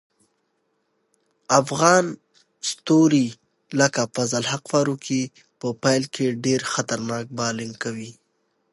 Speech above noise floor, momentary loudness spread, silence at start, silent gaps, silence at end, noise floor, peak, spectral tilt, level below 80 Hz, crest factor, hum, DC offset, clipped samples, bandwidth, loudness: 50 dB; 13 LU; 1.5 s; none; 0.6 s; -71 dBFS; 0 dBFS; -4 dB/octave; -68 dBFS; 22 dB; none; under 0.1%; under 0.1%; 11.5 kHz; -22 LUFS